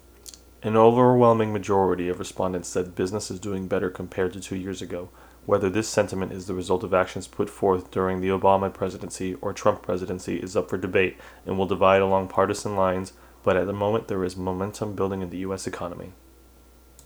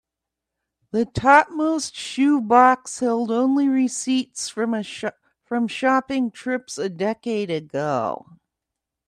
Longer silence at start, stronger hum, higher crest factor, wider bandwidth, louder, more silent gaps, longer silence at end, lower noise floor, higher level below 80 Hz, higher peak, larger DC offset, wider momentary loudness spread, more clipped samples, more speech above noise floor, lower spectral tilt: second, 0.25 s vs 0.95 s; neither; about the same, 22 dB vs 22 dB; first, over 20 kHz vs 11 kHz; second, -25 LUFS vs -21 LUFS; neither; about the same, 0.95 s vs 0.9 s; second, -52 dBFS vs -85 dBFS; about the same, -54 dBFS vs -58 dBFS; about the same, -2 dBFS vs 0 dBFS; neither; about the same, 13 LU vs 13 LU; neither; second, 28 dB vs 64 dB; first, -6 dB/octave vs -4.5 dB/octave